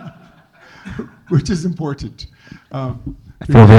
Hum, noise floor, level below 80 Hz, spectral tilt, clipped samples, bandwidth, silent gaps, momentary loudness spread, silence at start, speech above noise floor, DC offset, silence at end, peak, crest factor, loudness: none; -46 dBFS; -34 dBFS; -8 dB/octave; 0.3%; 9 kHz; none; 22 LU; 0.05 s; 35 dB; under 0.1%; 0 s; 0 dBFS; 14 dB; -18 LUFS